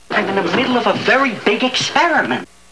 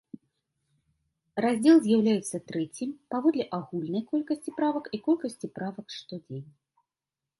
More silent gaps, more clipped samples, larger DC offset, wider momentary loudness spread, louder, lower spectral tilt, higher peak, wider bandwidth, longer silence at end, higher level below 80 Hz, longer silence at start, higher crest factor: neither; neither; first, 0.4% vs under 0.1%; second, 4 LU vs 19 LU; first, -15 LUFS vs -28 LUFS; second, -3.5 dB/octave vs -6 dB/octave; first, 0 dBFS vs -10 dBFS; about the same, 11 kHz vs 11.5 kHz; second, 0.25 s vs 0.95 s; first, -60 dBFS vs -72 dBFS; second, 0.1 s vs 1.35 s; about the same, 16 dB vs 20 dB